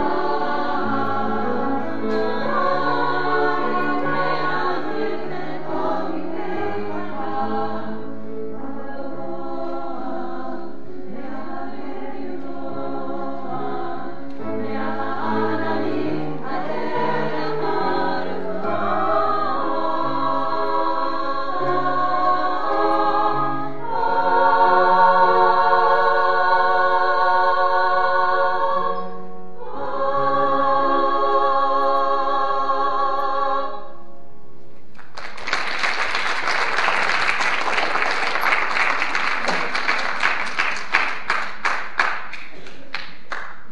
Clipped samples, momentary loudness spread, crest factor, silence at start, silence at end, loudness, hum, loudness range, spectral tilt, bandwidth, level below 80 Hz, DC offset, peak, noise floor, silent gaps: under 0.1%; 15 LU; 22 dB; 0 s; 0.1 s; -21 LUFS; none; 13 LU; -4.5 dB/octave; 12 kHz; -58 dBFS; 7%; 0 dBFS; -48 dBFS; none